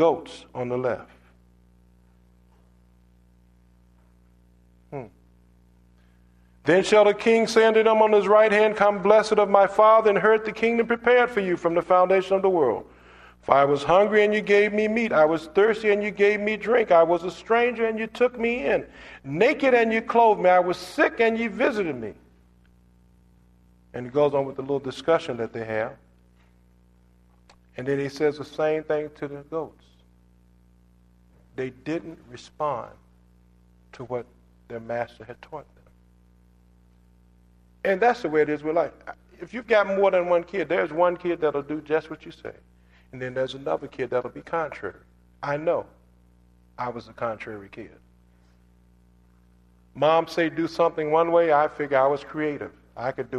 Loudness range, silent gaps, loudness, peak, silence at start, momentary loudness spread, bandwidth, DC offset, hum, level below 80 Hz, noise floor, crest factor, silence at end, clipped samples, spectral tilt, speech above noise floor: 16 LU; none; -22 LUFS; 0 dBFS; 0 s; 20 LU; 11 kHz; under 0.1%; 60 Hz at -55 dBFS; -58 dBFS; -57 dBFS; 24 dB; 0 s; under 0.1%; -5.5 dB/octave; 35 dB